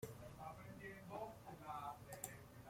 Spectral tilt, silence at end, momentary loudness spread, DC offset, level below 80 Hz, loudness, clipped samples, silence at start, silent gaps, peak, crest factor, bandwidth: -4.5 dB/octave; 0 s; 4 LU; under 0.1%; -72 dBFS; -53 LUFS; under 0.1%; 0 s; none; -28 dBFS; 26 dB; 16.5 kHz